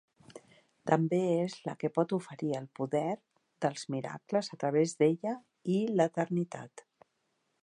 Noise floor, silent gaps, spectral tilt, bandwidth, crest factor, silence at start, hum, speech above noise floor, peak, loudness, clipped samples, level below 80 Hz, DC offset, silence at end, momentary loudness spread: -79 dBFS; none; -6.5 dB/octave; 11 kHz; 22 dB; 0.3 s; none; 47 dB; -10 dBFS; -32 LUFS; under 0.1%; -80 dBFS; under 0.1%; 0.8 s; 10 LU